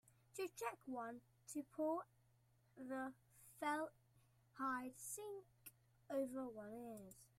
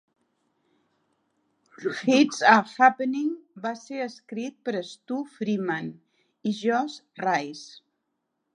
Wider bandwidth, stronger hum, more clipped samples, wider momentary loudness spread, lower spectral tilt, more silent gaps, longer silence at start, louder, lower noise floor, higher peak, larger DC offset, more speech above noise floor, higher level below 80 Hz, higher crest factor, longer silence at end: first, 16 kHz vs 10.5 kHz; neither; neither; about the same, 18 LU vs 16 LU; about the same, -4 dB/octave vs -4.5 dB/octave; neither; second, 0.05 s vs 1.8 s; second, -49 LUFS vs -25 LUFS; about the same, -76 dBFS vs -79 dBFS; second, -32 dBFS vs -2 dBFS; neither; second, 28 dB vs 54 dB; about the same, -86 dBFS vs -82 dBFS; second, 18 dB vs 24 dB; second, 0.15 s vs 0.85 s